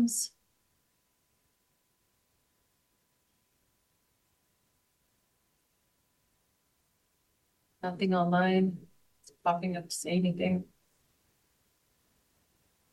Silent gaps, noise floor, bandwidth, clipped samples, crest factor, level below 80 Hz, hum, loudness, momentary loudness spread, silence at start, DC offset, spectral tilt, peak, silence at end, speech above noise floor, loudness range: none; -75 dBFS; 12.5 kHz; under 0.1%; 20 dB; -76 dBFS; none; -31 LUFS; 11 LU; 0 s; under 0.1%; -5 dB/octave; -16 dBFS; 2.3 s; 46 dB; 8 LU